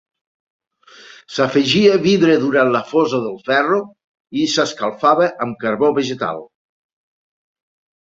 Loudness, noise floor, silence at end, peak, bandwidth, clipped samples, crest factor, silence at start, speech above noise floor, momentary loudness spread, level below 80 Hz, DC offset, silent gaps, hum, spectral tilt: -16 LUFS; -43 dBFS; 1.55 s; -2 dBFS; 7.8 kHz; under 0.1%; 16 dB; 1.3 s; 27 dB; 11 LU; -60 dBFS; under 0.1%; 4.04-4.25 s; none; -5 dB/octave